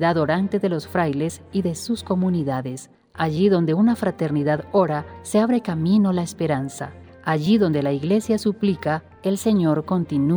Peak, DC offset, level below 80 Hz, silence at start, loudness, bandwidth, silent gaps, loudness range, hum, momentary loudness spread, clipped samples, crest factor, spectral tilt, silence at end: -6 dBFS; under 0.1%; -54 dBFS; 0 s; -22 LUFS; over 20 kHz; none; 2 LU; none; 8 LU; under 0.1%; 16 dB; -7 dB/octave; 0 s